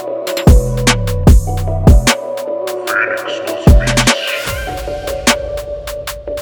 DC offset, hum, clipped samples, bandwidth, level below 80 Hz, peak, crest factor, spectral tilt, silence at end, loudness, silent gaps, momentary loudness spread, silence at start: under 0.1%; none; under 0.1%; over 20 kHz; -16 dBFS; 0 dBFS; 12 dB; -4.5 dB/octave; 0 s; -14 LUFS; none; 12 LU; 0 s